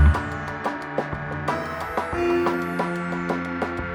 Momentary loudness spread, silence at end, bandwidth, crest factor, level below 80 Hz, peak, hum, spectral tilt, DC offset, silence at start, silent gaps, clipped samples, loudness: 7 LU; 0 s; 12.5 kHz; 18 dB; -30 dBFS; -6 dBFS; none; -7.5 dB/octave; under 0.1%; 0 s; none; under 0.1%; -26 LUFS